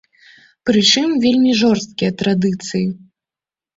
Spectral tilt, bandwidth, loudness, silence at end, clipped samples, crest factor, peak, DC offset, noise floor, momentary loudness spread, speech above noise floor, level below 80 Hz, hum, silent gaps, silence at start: -4.5 dB/octave; 8 kHz; -16 LUFS; 0.8 s; under 0.1%; 16 dB; -2 dBFS; under 0.1%; under -90 dBFS; 10 LU; over 75 dB; -54 dBFS; none; none; 0.65 s